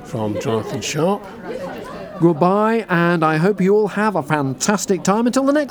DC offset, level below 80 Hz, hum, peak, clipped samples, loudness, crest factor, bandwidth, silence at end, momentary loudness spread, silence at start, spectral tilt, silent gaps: under 0.1%; -54 dBFS; none; 0 dBFS; under 0.1%; -18 LUFS; 18 dB; 20 kHz; 0 s; 13 LU; 0 s; -5.5 dB/octave; none